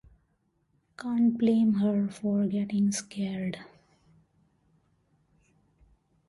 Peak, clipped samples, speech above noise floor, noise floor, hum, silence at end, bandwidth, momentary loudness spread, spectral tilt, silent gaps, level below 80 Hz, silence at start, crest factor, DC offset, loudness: -14 dBFS; under 0.1%; 46 dB; -73 dBFS; none; 2.6 s; 11.5 kHz; 11 LU; -6.5 dB/octave; none; -66 dBFS; 1 s; 16 dB; under 0.1%; -28 LUFS